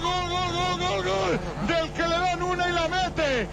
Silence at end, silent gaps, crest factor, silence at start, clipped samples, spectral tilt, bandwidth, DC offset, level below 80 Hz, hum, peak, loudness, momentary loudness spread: 0 s; none; 12 dB; 0 s; under 0.1%; -4.5 dB/octave; 15.5 kHz; under 0.1%; -40 dBFS; none; -12 dBFS; -25 LUFS; 2 LU